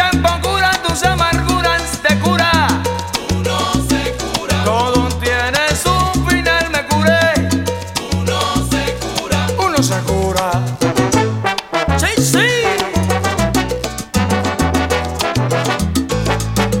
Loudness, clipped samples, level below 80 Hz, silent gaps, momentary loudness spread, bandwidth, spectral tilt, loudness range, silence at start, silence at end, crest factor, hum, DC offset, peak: -15 LUFS; under 0.1%; -28 dBFS; none; 5 LU; 16.5 kHz; -4.5 dB/octave; 2 LU; 0 s; 0 s; 16 dB; none; under 0.1%; 0 dBFS